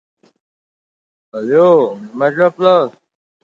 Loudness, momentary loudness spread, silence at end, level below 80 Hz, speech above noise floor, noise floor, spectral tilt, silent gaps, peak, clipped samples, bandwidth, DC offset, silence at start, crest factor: -12 LUFS; 13 LU; 0.55 s; -66 dBFS; over 78 dB; under -90 dBFS; -7.5 dB/octave; none; 0 dBFS; under 0.1%; 7.2 kHz; under 0.1%; 1.35 s; 14 dB